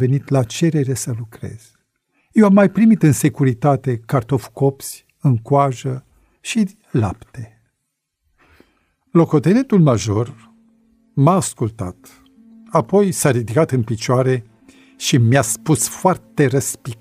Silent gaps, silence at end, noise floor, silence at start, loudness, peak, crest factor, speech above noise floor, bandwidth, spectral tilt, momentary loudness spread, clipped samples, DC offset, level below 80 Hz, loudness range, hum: none; 0.05 s; -74 dBFS; 0 s; -17 LUFS; -2 dBFS; 16 dB; 58 dB; 16 kHz; -6 dB/octave; 15 LU; under 0.1%; under 0.1%; -52 dBFS; 5 LU; none